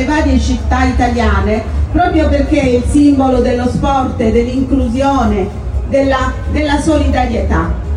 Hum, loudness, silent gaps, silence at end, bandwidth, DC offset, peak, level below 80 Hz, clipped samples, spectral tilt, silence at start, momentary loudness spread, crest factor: none; -13 LUFS; none; 0 s; 11 kHz; under 0.1%; 0 dBFS; -18 dBFS; under 0.1%; -7 dB/octave; 0 s; 5 LU; 12 dB